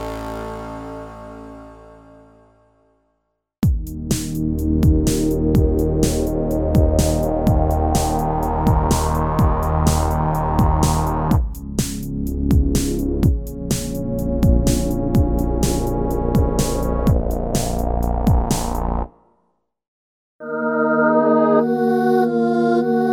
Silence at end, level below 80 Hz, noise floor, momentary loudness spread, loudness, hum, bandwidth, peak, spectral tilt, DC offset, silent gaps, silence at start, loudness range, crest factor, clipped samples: 0 s; -24 dBFS; -71 dBFS; 9 LU; -19 LUFS; none; 18 kHz; -2 dBFS; -6.5 dB/octave; under 0.1%; 19.88-20.39 s; 0 s; 5 LU; 18 dB; under 0.1%